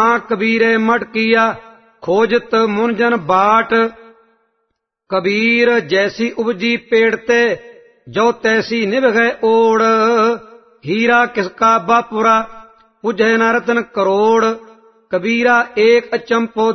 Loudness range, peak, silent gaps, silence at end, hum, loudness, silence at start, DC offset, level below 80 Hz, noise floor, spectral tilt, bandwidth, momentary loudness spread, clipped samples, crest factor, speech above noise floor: 2 LU; 0 dBFS; none; 0 s; none; -14 LUFS; 0 s; under 0.1%; -58 dBFS; -71 dBFS; -5 dB/octave; 6.4 kHz; 7 LU; under 0.1%; 14 dB; 57 dB